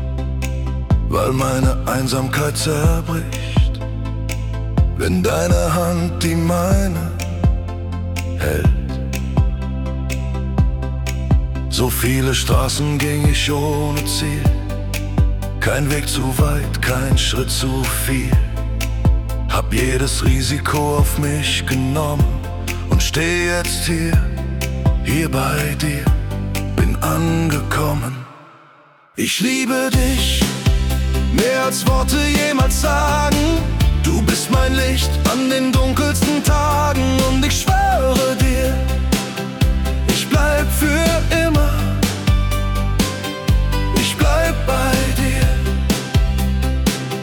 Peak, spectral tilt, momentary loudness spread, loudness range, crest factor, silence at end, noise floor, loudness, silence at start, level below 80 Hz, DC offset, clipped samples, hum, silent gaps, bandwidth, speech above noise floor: -4 dBFS; -5 dB/octave; 7 LU; 3 LU; 12 dB; 0 s; -48 dBFS; -18 LUFS; 0 s; -22 dBFS; under 0.1%; under 0.1%; none; none; 18 kHz; 32 dB